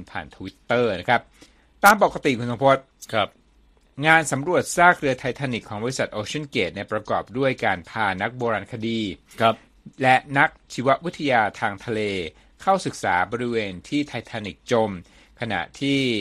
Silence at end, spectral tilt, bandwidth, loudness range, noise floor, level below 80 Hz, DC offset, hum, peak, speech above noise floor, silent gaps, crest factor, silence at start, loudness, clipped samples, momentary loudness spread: 0 s; -4.5 dB/octave; 14.5 kHz; 5 LU; -57 dBFS; -54 dBFS; under 0.1%; none; 0 dBFS; 35 dB; none; 24 dB; 0 s; -22 LUFS; under 0.1%; 12 LU